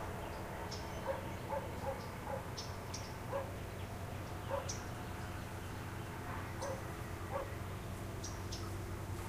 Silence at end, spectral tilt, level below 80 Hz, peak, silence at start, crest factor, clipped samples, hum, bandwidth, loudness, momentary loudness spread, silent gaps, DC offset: 0 s; -5 dB/octave; -54 dBFS; -26 dBFS; 0 s; 16 dB; under 0.1%; none; 15.5 kHz; -44 LUFS; 3 LU; none; under 0.1%